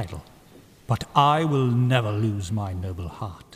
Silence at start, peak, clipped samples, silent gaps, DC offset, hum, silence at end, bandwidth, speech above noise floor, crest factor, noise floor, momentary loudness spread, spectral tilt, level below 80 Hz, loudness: 0 s; -4 dBFS; under 0.1%; none; under 0.1%; none; 0 s; 15 kHz; 27 dB; 20 dB; -51 dBFS; 15 LU; -6.5 dB/octave; -50 dBFS; -24 LUFS